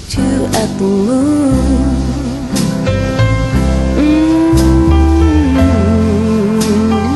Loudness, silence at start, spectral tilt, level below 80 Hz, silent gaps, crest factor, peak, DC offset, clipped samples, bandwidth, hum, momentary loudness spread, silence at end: -12 LUFS; 0 s; -6.5 dB/octave; -18 dBFS; none; 10 dB; 0 dBFS; under 0.1%; under 0.1%; 12.5 kHz; none; 5 LU; 0 s